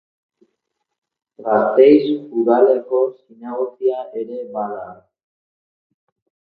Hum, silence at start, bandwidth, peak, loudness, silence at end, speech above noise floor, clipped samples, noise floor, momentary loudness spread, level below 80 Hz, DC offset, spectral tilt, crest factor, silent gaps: none; 1.4 s; 4.8 kHz; 0 dBFS; -17 LUFS; 1.55 s; 59 dB; under 0.1%; -75 dBFS; 18 LU; -68 dBFS; under 0.1%; -9.5 dB/octave; 18 dB; none